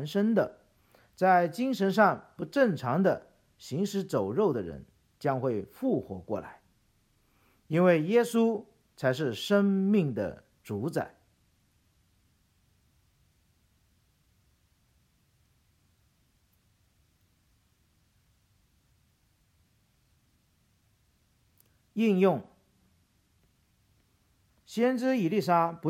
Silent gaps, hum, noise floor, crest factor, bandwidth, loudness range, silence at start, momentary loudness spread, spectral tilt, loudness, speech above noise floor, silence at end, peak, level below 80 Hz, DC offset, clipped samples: none; none; -69 dBFS; 22 dB; 16 kHz; 8 LU; 0 s; 13 LU; -7 dB/octave; -28 LUFS; 42 dB; 0 s; -10 dBFS; -70 dBFS; under 0.1%; under 0.1%